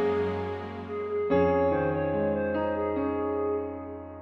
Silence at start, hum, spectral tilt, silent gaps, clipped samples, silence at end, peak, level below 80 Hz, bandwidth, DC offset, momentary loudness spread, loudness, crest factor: 0 s; none; -9.5 dB/octave; none; under 0.1%; 0 s; -12 dBFS; -52 dBFS; 5.8 kHz; under 0.1%; 12 LU; -28 LUFS; 16 dB